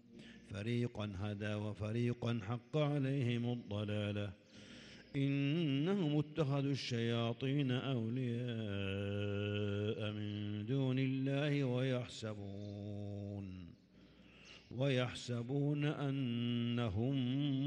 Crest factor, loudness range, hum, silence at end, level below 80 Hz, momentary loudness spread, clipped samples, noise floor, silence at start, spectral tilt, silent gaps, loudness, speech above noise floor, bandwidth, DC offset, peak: 16 dB; 4 LU; none; 0 s; -72 dBFS; 11 LU; under 0.1%; -63 dBFS; 0.1 s; -7.5 dB/octave; none; -39 LUFS; 26 dB; 9.8 kHz; under 0.1%; -24 dBFS